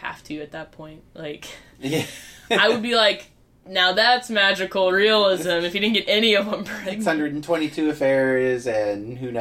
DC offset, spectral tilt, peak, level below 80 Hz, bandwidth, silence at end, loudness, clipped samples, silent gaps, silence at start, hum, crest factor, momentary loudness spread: under 0.1%; -4 dB/octave; -4 dBFS; -58 dBFS; 16 kHz; 0 s; -20 LUFS; under 0.1%; none; 0 s; none; 18 dB; 17 LU